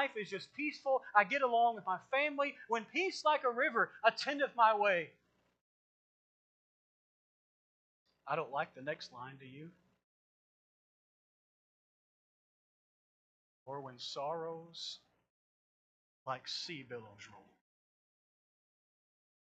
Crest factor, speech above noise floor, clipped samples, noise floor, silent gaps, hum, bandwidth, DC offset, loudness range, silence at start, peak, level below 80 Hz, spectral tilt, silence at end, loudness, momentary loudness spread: 26 dB; over 54 dB; under 0.1%; under -90 dBFS; 5.61-8.06 s, 10.04-13.66 s, 15.30-16.26 s; none; 8.8 kHz; under 0.1%; 16 LU; 0 s; -14 dBFS; under -90 dBFS; -3.5 dB/octave; 2.2 s; -35 LUFS; 19 LU